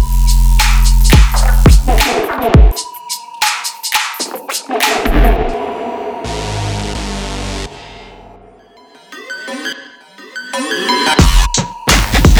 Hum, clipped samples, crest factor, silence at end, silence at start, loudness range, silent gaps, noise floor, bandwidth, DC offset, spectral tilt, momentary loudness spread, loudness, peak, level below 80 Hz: none; under 0.1%; 12 dB; 0 s; 0 s; 13 LU; none; -42 dBFS; over 20 kHz; under 0.1%; -4 dB/octave; 15 LU; -14 LUFS; 0 dBFS; -14 dBFS